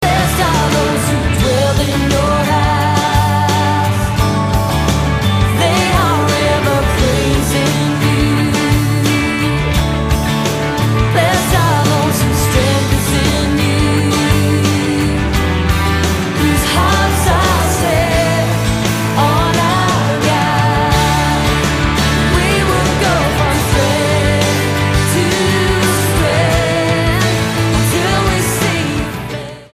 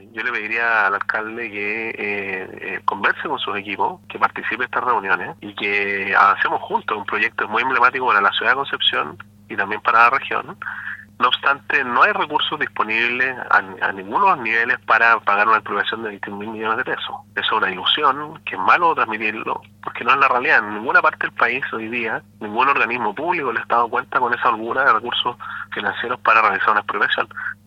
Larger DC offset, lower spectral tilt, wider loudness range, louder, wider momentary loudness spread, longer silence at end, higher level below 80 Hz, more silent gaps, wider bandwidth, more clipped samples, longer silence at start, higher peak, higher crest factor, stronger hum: neither; about the same, -5 dB/octave vs -4.5 dB/octave; second, 1 LU vs 4 LU; first, -13 LUFS vs -18 LUFS; second, 2 LU vs 11 LU; about the same, 0.1 s vs 0.15 s; first, -24 dBFS vs -66 dBFS; neither; first, 15.5 kHz vs 12 kHz; neither; second, 0 s vs 0.15 s; about the same, 0 dBFS vs 0 dBFS; second, 12 dB vs 20 dB; neither